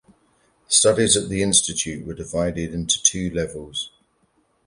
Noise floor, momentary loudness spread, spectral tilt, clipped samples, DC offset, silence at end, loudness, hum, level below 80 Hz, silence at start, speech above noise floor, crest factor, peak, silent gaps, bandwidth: -65 dBFS; 14 LU; -2.5 dB/octave; under 0.1%; under 0.1%; 0.8 s; -20 LUFS; none; -46 dBFS; 0.7 s; 43 dB; 22 dB; 0 dBFS; none; 11.5 kHz